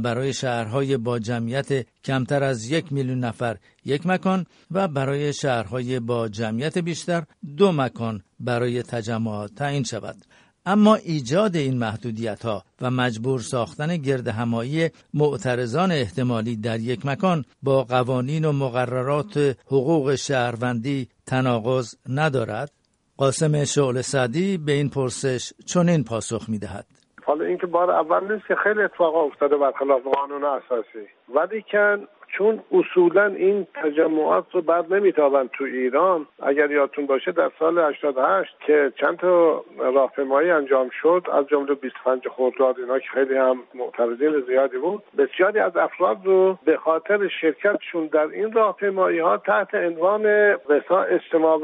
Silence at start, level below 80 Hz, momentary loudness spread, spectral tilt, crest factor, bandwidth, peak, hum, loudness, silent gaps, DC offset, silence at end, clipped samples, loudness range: 0 s; -62 dBFS; 8 LU; -6 dB/octave; 18 dB; 10.5 kHz; -4 dBFS; none; -22 LUFS; none; under 0.1%; 0 s; under 0.1%; 5 LU